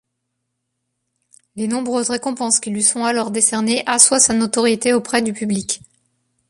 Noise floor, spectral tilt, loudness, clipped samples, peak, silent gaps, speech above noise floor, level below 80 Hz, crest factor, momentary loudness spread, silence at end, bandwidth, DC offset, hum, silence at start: -75 dBFS; -2 dB/octave; -16 LUFS; under 0.1%; 0 dBFS; none; 58 dB; -58 dBFS; 20 dB; 11 LU; 0.7 s; 13.5 kHz; under 0.1%; none; 1.55 s